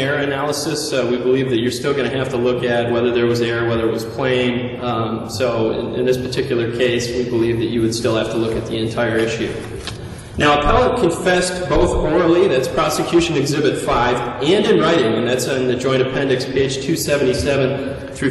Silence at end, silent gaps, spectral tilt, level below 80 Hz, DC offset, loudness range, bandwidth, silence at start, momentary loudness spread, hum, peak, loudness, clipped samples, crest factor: 0 s; none; -5 dB/octave; -36 dBFS; under 0.1%; 3 LU; 12.5 kHz; 0 s; 6 LU; none; -2 dBFS; -18 LUFS; under 0.1%; 16 dB